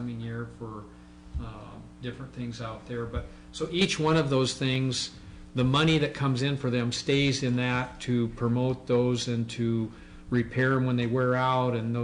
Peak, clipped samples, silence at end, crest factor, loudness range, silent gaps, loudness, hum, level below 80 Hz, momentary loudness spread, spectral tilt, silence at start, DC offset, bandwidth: -14 dBFS; under 0.1%; 0 s; 14 dB; 8 LU; none; -28 LUFS; none; -48 dBFS; 15 LU; -5.5 dB/octave; 0 s; under 0.1%; 10.5 kHz